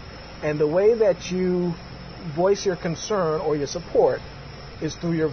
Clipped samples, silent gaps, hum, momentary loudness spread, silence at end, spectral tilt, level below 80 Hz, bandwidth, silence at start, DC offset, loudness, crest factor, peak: under 0.1%; none; none; 17 LU; 0 s; -6 dB/octave; -46 dBFS; 6.6 kHz; 0 s; under 0.1%; -23 LUFS; 16 dB; -8 dBFS